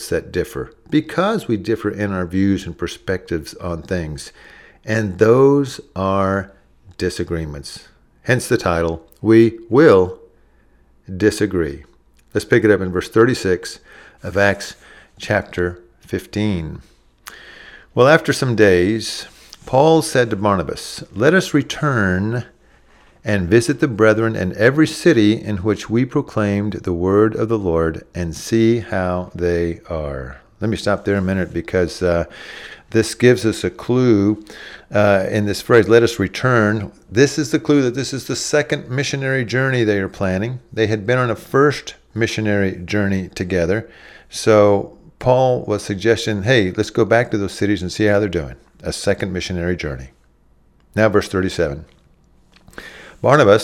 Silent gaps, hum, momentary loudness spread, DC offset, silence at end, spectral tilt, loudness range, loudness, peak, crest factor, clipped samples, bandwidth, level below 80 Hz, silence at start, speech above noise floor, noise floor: none; none; 14 LU; under 0.1%; 0 s; -6 dB/octave; 6 LU; -18 LUFS; 0 dBFS; 18 dB; under 0.1%; 15.5 kHz; -42 dBFS; 0 s; 37 dB; -54 dBFS